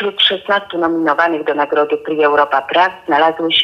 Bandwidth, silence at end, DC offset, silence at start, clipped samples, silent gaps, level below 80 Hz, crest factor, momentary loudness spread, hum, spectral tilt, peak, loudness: 7 kHz; 0 s; under 0.1%; 0 s; under 0.1%; none; -60 dBFS; 12 dB; 5 LU; none; -4.5 dB/octave; -2 dBFS; -14 LUFS